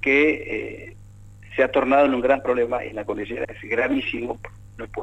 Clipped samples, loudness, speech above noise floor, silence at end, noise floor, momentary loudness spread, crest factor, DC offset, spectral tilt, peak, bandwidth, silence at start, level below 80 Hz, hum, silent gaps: under 0.1%; -22 LUFS; 22 dB; 0 s; -44 dBFS; 17 LU; 16 dB; under 0.1%; -6.5 dB/octave; -6 dBFS; 9 kHz; 0 s; -48 dBFS; 50 Hz at -45 dBFS; none